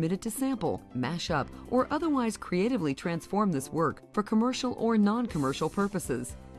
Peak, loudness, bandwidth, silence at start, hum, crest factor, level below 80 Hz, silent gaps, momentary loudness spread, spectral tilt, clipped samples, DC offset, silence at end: -14 dBFS; -30 LUFS; 13.5 kHz; 0 s; none; 16 dB; -54 dBFS; none; 6 LU; -6 dB/octave; under 0.1%; under 0.1%; 0 s